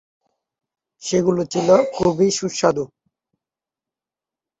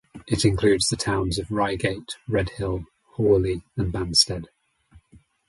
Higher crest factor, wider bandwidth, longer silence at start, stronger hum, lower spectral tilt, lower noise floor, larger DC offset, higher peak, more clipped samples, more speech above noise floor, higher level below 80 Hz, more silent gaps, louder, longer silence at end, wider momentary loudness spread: about the same, 20 dB vs 20 dB; second, 8.2 kHz vs 11.5 kHz; first, 1 s vs 0.15 s; neither; about the same, -5 dB/octave vs -4.5 dB/octave; first, -89 dBFS vs -56 dBFS; neither; about the same, -2 dBFS vs -4 dBFS; neither; first, 71 dB vs 33 dB; second, -56 dBFS vs -40 dBFS; neither; first, -19 LUFS vs -23 LUFS; first, 1.75 s vs 0.5 s; about the same, 11 LU vs 10 LU